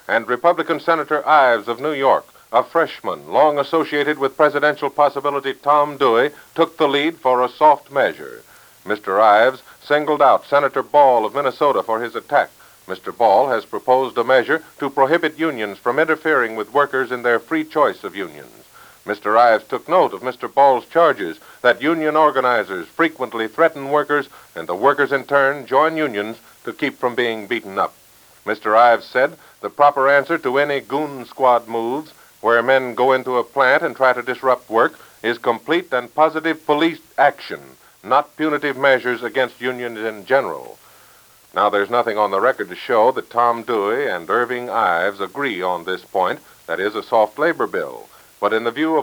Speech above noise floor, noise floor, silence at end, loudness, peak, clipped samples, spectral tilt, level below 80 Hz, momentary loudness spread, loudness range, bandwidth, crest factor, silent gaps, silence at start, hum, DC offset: 32 dB; -49 dBFS; 0 s; -18 LUFS; -2 dBFS; under 0.1%; -5 dB/octave; -68 dBFS; 11 LU; 4 LU; over 20 kHz; 16 dB; none; 0.1 s; none; under 0.1%